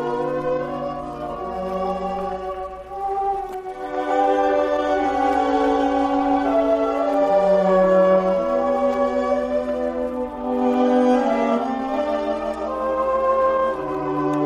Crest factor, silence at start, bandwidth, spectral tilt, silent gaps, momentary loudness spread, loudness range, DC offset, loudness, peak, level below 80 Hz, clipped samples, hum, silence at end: 14 dB; 0 s; 9.6 kHz; -7 dB/octave; none; 11 LU; 8 LU; under 0.1%; -21 LUFS; -6 dBFS; -46 dBFS; under 0.1%; none; 0 s